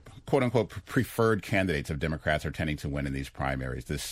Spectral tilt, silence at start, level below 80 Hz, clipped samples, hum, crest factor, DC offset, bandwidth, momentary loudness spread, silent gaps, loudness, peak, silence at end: -6 dB/octave; 0.05 s; -44 dBFS; under 0.1%; none; 20 dB; under 0.1%; 16 kHz; 7 LU; none; -30 LUFS; -10 dBFS; 0 s